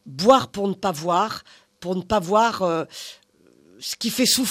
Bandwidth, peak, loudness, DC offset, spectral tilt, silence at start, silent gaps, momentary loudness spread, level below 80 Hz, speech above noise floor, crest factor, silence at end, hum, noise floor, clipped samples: 15.5 kHz; -2 dBFS; -21 LUFS; under 0.1%; -3.5 dB/octave; 0.05 s; none; 17 LU; -56 dBFS; 35 dB; 20 dB; 0 s; none; -56 dBFS; under 0.1%